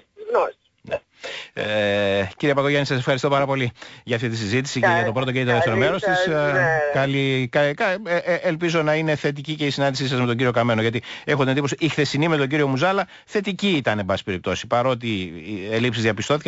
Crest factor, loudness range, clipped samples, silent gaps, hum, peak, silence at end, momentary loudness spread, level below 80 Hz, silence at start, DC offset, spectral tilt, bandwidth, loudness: 14 dB; 2 LU; under 0.1%; none; none; -8 dBFS; 0 s; 7 LU; -56 dBFS; 0.2 s; under 0.1%; -5.5 dB/octave; 8 kHz; -21 LUFS